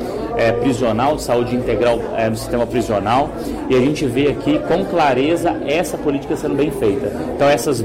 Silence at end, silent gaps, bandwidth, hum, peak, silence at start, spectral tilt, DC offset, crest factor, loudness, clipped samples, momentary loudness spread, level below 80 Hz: 0 s; none; 16 kHz; none; -6 dBFS; 0 s; -6 dB/octave; under 0.1%; 10 dB; -17 LUFS; under 0.1%; 5 LU; -38 dBFS